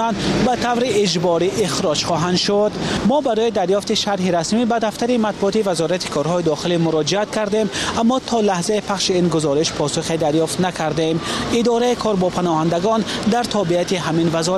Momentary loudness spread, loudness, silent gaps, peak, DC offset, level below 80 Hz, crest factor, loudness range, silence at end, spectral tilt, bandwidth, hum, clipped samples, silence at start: 3 LU; -18 LUFS; none; -6 dBFS; under 0.1%; -46 dBFS; 12 dB; 1 LU; 0 s; -4.5 dB/octave; 14 kHz; none; under 0.1%; 0 s